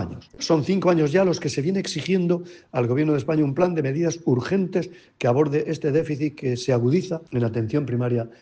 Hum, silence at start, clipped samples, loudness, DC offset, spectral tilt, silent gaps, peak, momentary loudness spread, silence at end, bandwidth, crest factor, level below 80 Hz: none; 0 s; under 0.1%; -23 LUFS; under 0.1%; -6.5 dB/octave; none; -6 dBFS; 6 LU; 0.1 s; 9.4 kHz; 16 dB; -58 dBFS